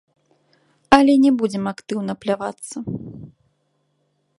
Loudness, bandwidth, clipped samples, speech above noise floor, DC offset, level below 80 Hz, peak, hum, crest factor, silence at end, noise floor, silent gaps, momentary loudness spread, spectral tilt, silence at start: -19 LUFS; 11.5 kHz; under 0.1%; 49 dB; under 0.1%; -52 dBFS; 0 dBFS; none; 22 dB; 1.1 s; -68 dBFS; none; 18 LU; -5.5 dB/octave; 0.9 s